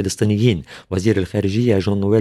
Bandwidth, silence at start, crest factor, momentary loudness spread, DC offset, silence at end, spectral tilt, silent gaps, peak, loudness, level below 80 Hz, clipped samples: 13 kHz; 0 s; 14 dB; 6 LU; under 0.1%; 0 s; -6.5 dB/octave; none; -2 dBFS; -18 LUFS; -46 dBFS; under 0.1%